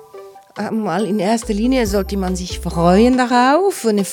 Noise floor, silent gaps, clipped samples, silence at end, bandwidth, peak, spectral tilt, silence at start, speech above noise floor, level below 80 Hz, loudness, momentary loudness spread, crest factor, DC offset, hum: -39 dBFS; none; under 0.1%; 0 s; 18 kHz; 0 dBFS; -5.5 dB/octave; 0.15 s; 23 dB; -32 dBFS; -16 LUFS; 11 LU; 16 dB; under 0.1%; none